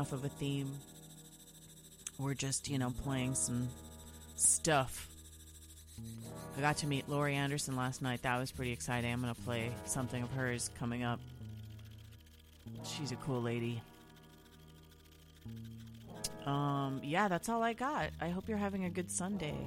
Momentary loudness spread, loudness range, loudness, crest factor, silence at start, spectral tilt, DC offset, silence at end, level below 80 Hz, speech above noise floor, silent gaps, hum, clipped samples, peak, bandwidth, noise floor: 20 LU; 9 LU; -37 LUFS; 22 dB; 0 s; -4 dB/octave; under 0.1%; 0 s; -58 dBFS; 23 dB; none; none; under 0.1%; -16 dBFS; 16.5 kHz; -60 dBFS